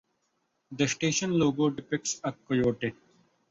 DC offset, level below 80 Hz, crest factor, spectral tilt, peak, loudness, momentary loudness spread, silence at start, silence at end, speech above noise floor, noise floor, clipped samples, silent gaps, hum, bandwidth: under 0.1%; -62 dBFS; 16 dB; -4.5 dB/octave; -12 dBFS; -28 LUFS; 9 LU; 0.7 s; 0.6 s; 48 dB; -76 dBFS; under 0.1%; none; none; 8 kHz